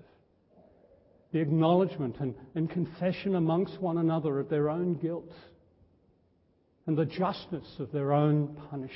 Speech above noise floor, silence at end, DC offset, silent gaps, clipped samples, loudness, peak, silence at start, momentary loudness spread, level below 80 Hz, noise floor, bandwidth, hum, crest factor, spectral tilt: 39 dB; 0 s; under 0.1%; none; under 0.1%; -30 LUFS; -12 dBFS; 1.35 s; 12 LU; -66 dBFS; -69 dBFS; 5.8 kHz; none; 18 dB; -12 dB/octave